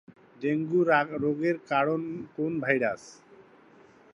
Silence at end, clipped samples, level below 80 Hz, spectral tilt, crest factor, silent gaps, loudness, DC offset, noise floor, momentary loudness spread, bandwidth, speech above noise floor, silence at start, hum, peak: 1 s; under 0.1%; -72 dBFS; -7 dB/octave; 20 dB; none; -27 LUFS; under 0.1%; -56 dBFS; 9 LU; 9.6 kHz; 29 dB; 0.4 s; none; -8 dBFS